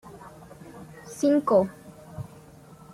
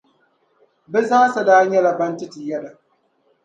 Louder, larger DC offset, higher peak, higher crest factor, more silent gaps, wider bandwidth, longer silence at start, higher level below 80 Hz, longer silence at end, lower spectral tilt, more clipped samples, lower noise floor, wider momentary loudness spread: second, -24 LUFS vs -17 LUFS; neither; second, -10 dBFS vs 0 dBFS; about the same, 20 dB vs 18 dB; neither; first, 15 kHz vs 8.8 kHz; second, 0.05 s vs 0.9 s; first, -62 dBFS vs -76 dBFS; about the same, 0.7 s vs 0.75 s; first, -7 dB/octave vs -5 dB/octave; neither; second, -49 dBFS vs -63 dBFS; first, 25 LU vs 16 LU